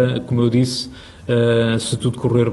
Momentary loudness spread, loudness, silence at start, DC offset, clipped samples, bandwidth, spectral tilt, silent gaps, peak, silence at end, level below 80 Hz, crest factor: 9 LU; -18 LUFS; 0 s; under 0.1%; under 0.1%; 12 kHz; -6 dB/octave; none; -4 dBFS; 0 s; -46 dBFS; 14 dB